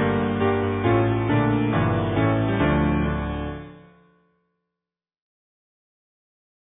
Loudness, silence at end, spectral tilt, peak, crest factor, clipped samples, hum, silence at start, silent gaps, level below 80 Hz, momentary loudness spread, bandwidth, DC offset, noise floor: -22 LUFS; 2.9 s; -11.5 dB/octave; -8 dBFS; 16 dB; under 0.1%; none; 0 s; none; -38 dBFS; 8 LU; 3.9 kHz; under 0.1%; -89 dBFS